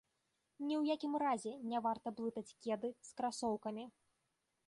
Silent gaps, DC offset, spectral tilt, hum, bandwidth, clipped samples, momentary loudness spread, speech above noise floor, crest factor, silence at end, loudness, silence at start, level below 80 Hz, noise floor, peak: none; under 0.1%; -4.5 dB/octave; none; 11.5 kHz; under 0.1%; 9 LU; 45 dB; 14 dB; 0.8 s; -41 LUFS; 0.6 s; -82 dBFS; -85 dBFS; -26 dBFS